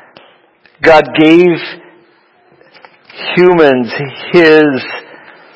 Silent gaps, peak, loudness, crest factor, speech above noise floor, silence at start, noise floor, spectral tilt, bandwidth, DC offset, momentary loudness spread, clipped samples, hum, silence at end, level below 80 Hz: none; 0 dBFS; -9 LUFS; 12 dB; 40 dB; 0.8 s; -48 dBFS; -7 dB/octave; 8 kHz; under 0.1%; 16 LU; 1%; none; 0.55 s; -48 dBFS